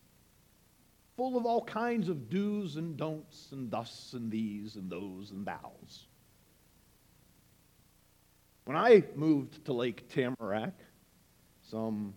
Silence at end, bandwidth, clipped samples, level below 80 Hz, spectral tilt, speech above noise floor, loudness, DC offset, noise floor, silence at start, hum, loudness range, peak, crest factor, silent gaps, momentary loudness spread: 0 s; 18 kHz; under 0.1%; -72 dBFS; -7 dB/octave; 34 dB; -33 LUFS; under 0.1%; -66 dBFS; 1.2 s; none; 16 LU; -10 dBFS; 24 dB; none; 15 LU